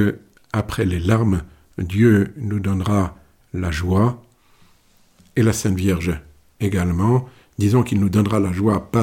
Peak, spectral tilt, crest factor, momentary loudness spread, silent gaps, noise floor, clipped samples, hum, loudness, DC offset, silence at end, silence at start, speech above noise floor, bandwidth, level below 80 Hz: -4 dBFS; -7 dB/octave; 16 dB; 10 LU; none; -55 dBFS; under 0.1%; none; -20 LUFS; under 0.1%; 0 s; 0 s; 37 dB; 16.5 kHz; -38 dBFS